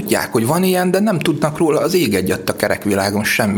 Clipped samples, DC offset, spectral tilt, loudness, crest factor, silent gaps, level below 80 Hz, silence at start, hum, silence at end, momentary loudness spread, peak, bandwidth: under 0.1%; under 0.1%; -5 dB/octave; -16 LUFS; 16 dB; none; -50 dBFS; 0 s; none; 0 s; 3 LU; 0 dBFS; over 20 kHz